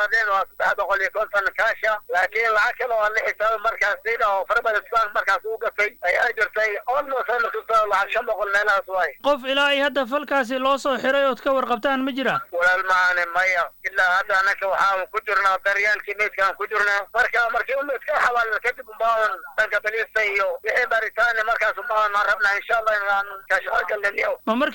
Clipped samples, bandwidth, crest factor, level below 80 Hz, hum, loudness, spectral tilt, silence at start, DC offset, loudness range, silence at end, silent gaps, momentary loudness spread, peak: under 0.1%; 17.5 kHz; 12 dB; -56 dBFS; none; -21 LUFS; -2.5 dB/octave; 0 s; under 0.1%; 2 LU; 0 s; none; 4 LU; -10 dBFS